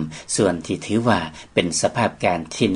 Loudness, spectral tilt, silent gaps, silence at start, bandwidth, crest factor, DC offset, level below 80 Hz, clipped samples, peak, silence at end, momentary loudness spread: -21 LUFS; -4.5 dB/octave; none; 0 s; 11 kHz; 18 dB; under 0.1%; -50 dBFS; under 0.1%; -2 dBFS; 0 s; 4 LU